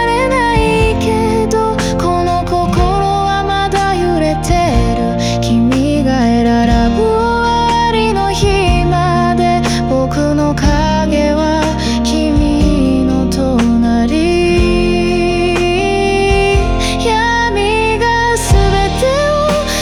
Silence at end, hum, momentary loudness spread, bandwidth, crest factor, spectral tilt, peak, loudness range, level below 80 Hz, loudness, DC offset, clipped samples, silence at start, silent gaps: 0 s; none; 2 LU; 16 kHz; 10 dB; -5.5 dB/octave; 0 dBFS; 1 LU; -20 dBFS; -12 LUFS; under 0.1%; under 0.1%; 0 s; none